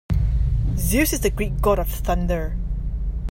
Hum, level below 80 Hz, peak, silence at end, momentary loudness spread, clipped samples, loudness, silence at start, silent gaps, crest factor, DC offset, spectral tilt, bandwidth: none; -24 dBFS; -6 dBFS; 0 s; 9 LU; under 0.1%; -23 LUFS; 0.1 s; none; 14 dB; under 0.1%; -5.5 dB/octave; 16.5 kHz